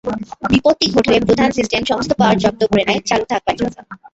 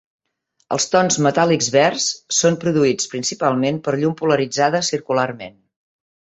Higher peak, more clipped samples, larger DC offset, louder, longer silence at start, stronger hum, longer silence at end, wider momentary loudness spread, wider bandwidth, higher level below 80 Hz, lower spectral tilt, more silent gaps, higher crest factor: about the same, -2 dBFS vs -2 dBFS; neither; neither; about the same, -16 LUFS vs -18 LUFS; second, 0.05 s vs 0.7 s; neither; second, 0.2 s vs 0.9 s; about the same, 8 LU vs 6 LU; about the same, 8.2 kHz vs 8.4 kHz; first, -42 dBFS vs -60 dBFS; first, -5 dB/octave vs -3.5 dB/octave; neither; about the same, 14 dB vs 18 dB